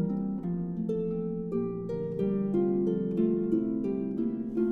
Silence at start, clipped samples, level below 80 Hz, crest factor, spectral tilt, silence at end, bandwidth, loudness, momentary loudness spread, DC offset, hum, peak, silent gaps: 0 s; under 0.1%; -54 dBFS; 14 dB; -11.5 dB/octave; 0 s; 3.8 kHz; -30 LUFS; 5 LU; under 0.1%; none; -16 dBFS; none